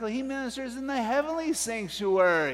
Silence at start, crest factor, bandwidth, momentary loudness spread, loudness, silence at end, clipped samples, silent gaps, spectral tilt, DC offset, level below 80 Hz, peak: 0 s; 18 dB; 16 kHz; 10 LU; -28 LUFS; 0 s; under 0.1%; none; -3.5 dB/octave; under 0.1%; -60 dBFS; -10 dBFS